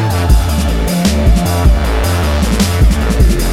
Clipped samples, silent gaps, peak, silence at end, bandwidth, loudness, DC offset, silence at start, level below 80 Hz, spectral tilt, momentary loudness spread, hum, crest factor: under 0.1%; none; 0 dBFS; 0 s; 16 kHz; -13 LUFS; 0.9%; 0 s; -12 dBFS; -5.5 dB/octave; 3 LU; none; 10 dB